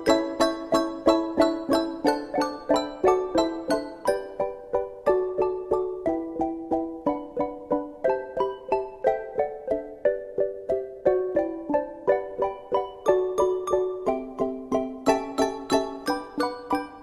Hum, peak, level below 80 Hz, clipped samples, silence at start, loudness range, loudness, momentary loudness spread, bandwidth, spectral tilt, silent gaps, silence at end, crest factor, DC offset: none; -6 dBFS; -54 dBFS; under 0.1%; 0 s; 4 LU; -26 LUFS; 7 LU; 15 kHz; -4.5 dB/octave; none; 0 s; 20 dB; under 0.1%